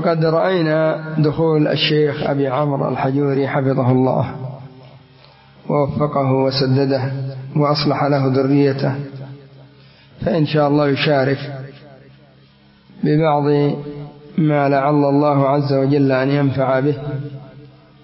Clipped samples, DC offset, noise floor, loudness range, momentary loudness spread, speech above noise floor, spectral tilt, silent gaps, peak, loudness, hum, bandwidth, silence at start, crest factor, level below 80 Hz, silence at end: under 0.1%; under 0.1%; -49 dBFS; 4 LU; 12 LU; 33 dB; -11 dB/octave; none; -4 dBFS; -17 LUFS; none; 5.8 kHz; 0 s; 14 dB; -52 dBFS; 0.4 s